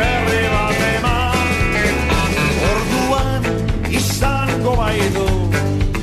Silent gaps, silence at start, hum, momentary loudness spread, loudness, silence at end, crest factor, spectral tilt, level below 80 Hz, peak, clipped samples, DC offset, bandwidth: none; 0 s; none; 3 LU; -17 LUFS; 0 s; 10 dB; -5 dB/octave; -24 dBFS; -6 dBFS; under 0.1%; under 0.1%; 14 kHz